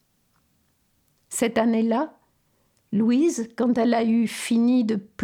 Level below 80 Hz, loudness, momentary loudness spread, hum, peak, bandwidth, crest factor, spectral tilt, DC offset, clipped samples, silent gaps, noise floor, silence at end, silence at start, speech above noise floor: -68 dBFS; -23 LUFS; 7 LU; none; -10 dBFS; 15.5 kHz; 14 dB; -5 dB/octave; under 0.1%; under 0.1%; none; -67 dBFS; 0 s; 1.3 s; 46 dB